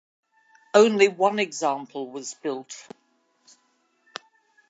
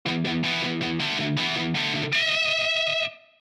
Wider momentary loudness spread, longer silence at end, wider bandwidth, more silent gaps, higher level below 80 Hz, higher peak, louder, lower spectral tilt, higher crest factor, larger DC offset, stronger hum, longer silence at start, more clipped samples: first, 23 LU vs 5 LU; first, 1.9 s vs 0.25 s; second, 8 kHz vs 13.5 kHz; neither; second, -84 dBFS vs -60 dBFS; first, -4 dBFS vs -14 dBFS; about the same, -23 LUFS vs -24 LUFS; about the same, -3.5 dB/octave vs -4 dB/octave; first, 22 dB vs 12 dB; neither; neither; first, 0.75 s vs 0.05 s; neither